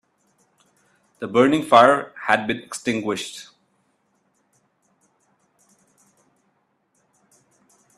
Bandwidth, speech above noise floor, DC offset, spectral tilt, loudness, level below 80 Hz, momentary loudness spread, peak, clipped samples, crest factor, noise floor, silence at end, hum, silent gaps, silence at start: 13.5 kHz; 49 dB; under 0.1%; -4.5 dB/octave; -19 LUFS; -68 dBFS; 18 LU; 0 dBFS; under 0.1%; 24 dB; -68 dBFS; 4.55 s; none; none; 1.2 s